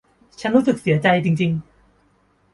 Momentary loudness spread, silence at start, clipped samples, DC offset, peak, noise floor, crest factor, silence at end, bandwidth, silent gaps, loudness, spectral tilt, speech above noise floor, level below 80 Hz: 9 LU; 0.4 s; under 0.1%; under 0.1%; -2 dBFS; -60 dBFS; 18 dB; 0.95 s; 11.5 kHz; none; -19 LUFS; -7 dB/octave; 42 dB; -56 dBFS